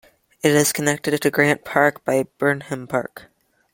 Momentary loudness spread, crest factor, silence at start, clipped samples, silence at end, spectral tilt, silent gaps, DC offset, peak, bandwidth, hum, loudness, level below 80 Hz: 9 LU; 20 dB; 0.45 s; under 0.1%; 0.55 s; -4 dB/octave; none; under 0.1%; 0 dBFS; 17 kHz; none; -20 LUFS; -62 dBFS